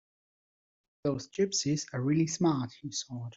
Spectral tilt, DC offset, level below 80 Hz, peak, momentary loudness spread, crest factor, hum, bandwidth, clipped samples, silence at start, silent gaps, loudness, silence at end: -5 dB/octave; under 0.1%; -68 dBFS; -16 dBFS; 8 LU; 16 dB; none; 8 kHz; under 0.1%; 1.05 s; none; -31 LUFS; 0.05 s